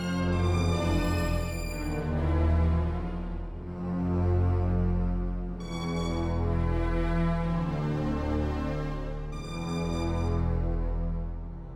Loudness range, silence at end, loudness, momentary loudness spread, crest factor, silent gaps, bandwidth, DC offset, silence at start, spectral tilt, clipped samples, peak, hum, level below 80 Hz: 2 LU; 0 s; -30 LUFS; 10 LU; 12 dB; none; 13 kHz; 0.2%; 0 s; -7.5 dB/octave; under 0.1%; -16 dBFS; none; -32 dBFS